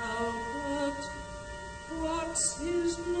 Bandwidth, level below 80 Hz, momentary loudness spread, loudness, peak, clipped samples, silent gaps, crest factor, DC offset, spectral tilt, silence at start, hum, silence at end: 9.4 kHz; -50 dBFS; 13 LU; -33 LUFS; -18 dBFS; under 0.1%; none; 16 dB; under 0.1%; -3 dB/octave; 0 s; none; 0 s